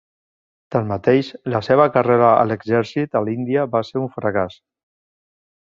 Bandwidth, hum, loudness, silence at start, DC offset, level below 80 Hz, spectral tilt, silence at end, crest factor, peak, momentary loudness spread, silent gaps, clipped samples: 7.4 kHz; none; -19 LUFS; 0.7 s; under 0.1%; -54 dBFS; -8 dB/octave; 1.2 s; 18 dB; -2 dBFS; 9 LU; none; under 0.1%